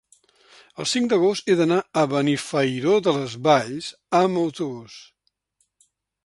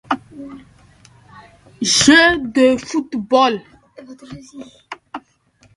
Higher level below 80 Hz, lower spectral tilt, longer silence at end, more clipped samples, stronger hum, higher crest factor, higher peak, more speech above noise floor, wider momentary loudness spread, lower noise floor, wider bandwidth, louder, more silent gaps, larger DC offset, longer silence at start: second, -66 dBFS vs -50 dBFS; first, -5 dB/octave vs -2.5 dB/octave; first, 1.2 s vs 0.55 s; neither; neither; about the same, 18 dB vs 18 dB; second, -4 dBFS vs 0 dBFS; first, 50 dB vs 39 dB; second, 11 LU vs 27 LU; first, -71 dBFS vs -55 dBFS; about the same, 11.5 kHz vs 11.5 kHz; second, -22 LUFS vs -14 LUFS; neither; neither; first, 0.8 s vs 0.1 s